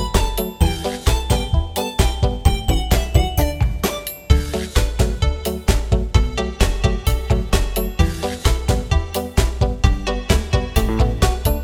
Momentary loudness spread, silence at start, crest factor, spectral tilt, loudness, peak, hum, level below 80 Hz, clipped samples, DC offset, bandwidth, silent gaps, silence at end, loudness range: 3 LU; 0 s; 18 dB; -5 dB/octave; -20 LUFS; 0 dBFS; none; -20 dBFS; under 0.1%; under 0.1%; 18 kHz; none; 0 s; 1 LU